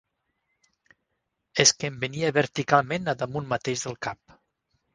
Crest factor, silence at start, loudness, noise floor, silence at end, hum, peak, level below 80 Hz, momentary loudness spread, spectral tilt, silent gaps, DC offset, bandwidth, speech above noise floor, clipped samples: 26 dB; 1.55 s; -25 LUFS; -79 dBFS; 0.8 s; none; -2 dBFS; -62 dBFS; 13 LU; -3 dB/octave; none; under 0.1%; 10.5 kHz; 54 dB; under 0.1%